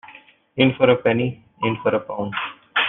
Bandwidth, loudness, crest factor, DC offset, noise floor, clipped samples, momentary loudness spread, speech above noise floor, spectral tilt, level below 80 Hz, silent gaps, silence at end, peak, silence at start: 4.1 kHz; -21 LUFS; 20 dB; under 0.1%; -47 dBFS; under 0.1%; 11 LU; 28 dB; -9.5 dB/octave; -60 dBFS; none; 0 s; -2 dBFS; 0.05 s